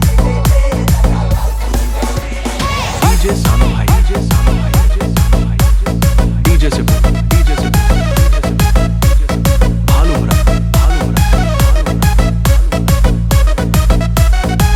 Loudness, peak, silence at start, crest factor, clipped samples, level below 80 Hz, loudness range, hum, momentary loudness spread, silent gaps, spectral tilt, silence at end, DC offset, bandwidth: -12 LUFS; 0 dBFS; 0 s; 10 dB; under 0.1%; -12 dBFS; 2 LU; none; 3 LU; none; -5.5 dB/octave; 0 s; under 0.1%; 16.5 kHz